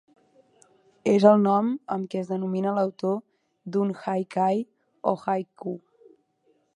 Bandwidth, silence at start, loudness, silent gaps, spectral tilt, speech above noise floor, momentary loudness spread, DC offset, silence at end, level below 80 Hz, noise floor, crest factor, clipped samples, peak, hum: 9.8 kHz; 1.05 s; -25 LUFS; none; -8 dB/octave; 44 dB; 17 LU; under 0.1%; 1 s; -76 dBFS; -68 dBFS; 24 dB; under 0.1%; -2 dBFS; none